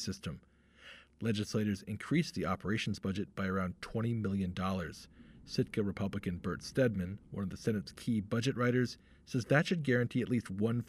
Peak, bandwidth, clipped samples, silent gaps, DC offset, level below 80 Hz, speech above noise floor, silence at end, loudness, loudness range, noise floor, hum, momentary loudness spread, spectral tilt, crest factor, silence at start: -16 dBFS; 14.5 kHz; under 0.1%; none; under 0.1%; -62 dBFS; 22 dB; 0.05 s; -35 LUFS; 3 LU; -57 dBFS; none; 10 LU; -6.5 dB/octave; 18 dB; 0 s